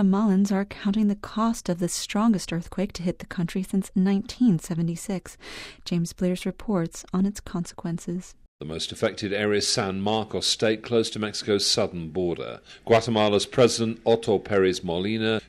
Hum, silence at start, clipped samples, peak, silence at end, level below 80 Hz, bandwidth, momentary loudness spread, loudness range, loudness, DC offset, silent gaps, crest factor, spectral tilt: none; 0 s; under 0.1%; -6 dBFS; 0.05 s; -52 dBFS; 15 kHz; 11 LU; 6 LU; -25 LUFS; under 0.1%; 8.48-8.59 s; 20 dB; -5 dB/octave